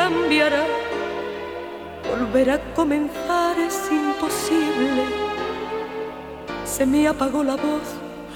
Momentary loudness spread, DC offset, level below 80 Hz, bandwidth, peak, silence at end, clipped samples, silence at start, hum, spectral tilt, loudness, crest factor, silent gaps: 13 LU; under 0.1%; -46 dBFS; 18 kHz; -4 dBFS; 0 s; under 0.1%; 0 s; none; -4 dB/octave; -22 LUFS; 18 dB; none